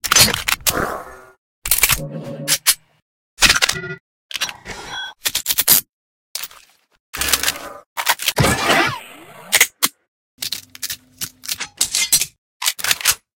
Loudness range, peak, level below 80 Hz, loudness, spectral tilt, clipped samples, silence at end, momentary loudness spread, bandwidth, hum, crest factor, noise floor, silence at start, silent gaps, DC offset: 3 LU; 0 dBFS; -42 dBFS; -17 LUFS; -1 dB/octave; under 0.1%; 0.2 s; 17 LU; 17.5 kHz; none; 20 dB; -48 dBFS; 0.05 s; 1.38-1.62 s, 3.02-3.37 s, 4.00-4.29 s, 5.89-6.35 s, 7.00-7.13 s, 7.86-7.96 s, 10.08-10.38 s, 12.38-12.60 s; under 0.1%